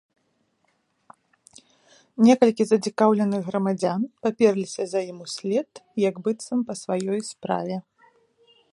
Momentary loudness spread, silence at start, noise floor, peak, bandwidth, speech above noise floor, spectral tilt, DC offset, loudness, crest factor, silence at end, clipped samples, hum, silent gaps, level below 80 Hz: 11 LU; 2.2 s; -70 dBFS; -2 dBFS; 11.5 kHz; 47 dB; -6 dB/octave; under 0.1%; -24 LUFS; 22 dB; 0.9 s; under 0.1%; none; none; -74 dBFS